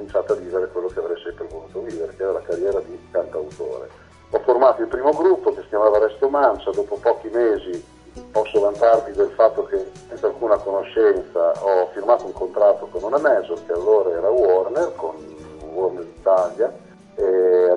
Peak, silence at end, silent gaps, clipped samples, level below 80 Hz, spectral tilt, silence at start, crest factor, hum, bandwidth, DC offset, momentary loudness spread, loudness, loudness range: -2 dBFS; 0 s; none; under 0.1%; -52 dBFS; -6 dB/octave; 0 s; 18 dB; none; 10 kHz; under 0.1%; 14 LU; -20 LUFS; 7 LU